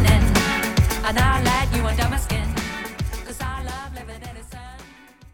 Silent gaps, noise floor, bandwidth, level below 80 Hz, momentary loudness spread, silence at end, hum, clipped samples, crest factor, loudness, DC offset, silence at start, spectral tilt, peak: none; -46 dBFS; over 20 kHz; -26 dBFS; 19 LU; 0.05 s; none; under 0.1%; 18 dB; -22 LUFS; under 0.1%; 0 s; -5 dB/octave; -4 dBFS